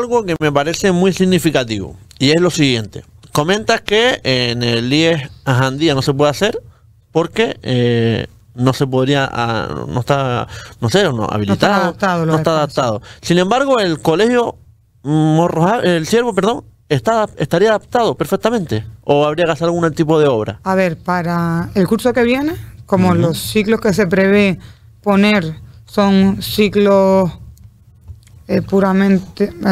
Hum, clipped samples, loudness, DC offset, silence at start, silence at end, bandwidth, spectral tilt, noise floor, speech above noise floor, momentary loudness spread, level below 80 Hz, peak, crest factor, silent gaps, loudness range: none; under 0.1%; -15 LUFS; under 0.1%; 0 s; 0 s; 15.5 kHz; -5.5 dB/octave; -43 dBFS; 28 dB; 8 LU; -44 dBFS; 0 dBFS; 14 dB; none; 2 LU